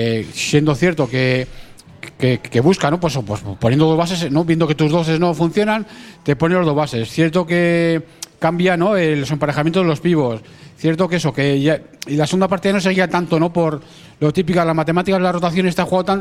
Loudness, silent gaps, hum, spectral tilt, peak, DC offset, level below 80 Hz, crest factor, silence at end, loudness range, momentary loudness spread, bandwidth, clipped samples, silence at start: -17 LUFS; none; none; -6 dB/octave; 0 dBFS; under 0.1%; -46 dBFS; 16 dB; 0 s; 1 LU; 7 LU; 14.5 kHz; under 0.1%; 0 s